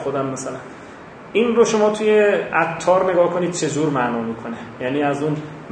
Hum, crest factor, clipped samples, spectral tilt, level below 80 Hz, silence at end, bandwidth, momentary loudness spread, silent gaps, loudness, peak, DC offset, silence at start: none; 16 dB; under 0.1%; -5 dB/octave; -58 dBFS; 0 s; 9.8 kHz; 15 LU; none; -19 LUFS; -2 dBFS; under 0.1%; 0 s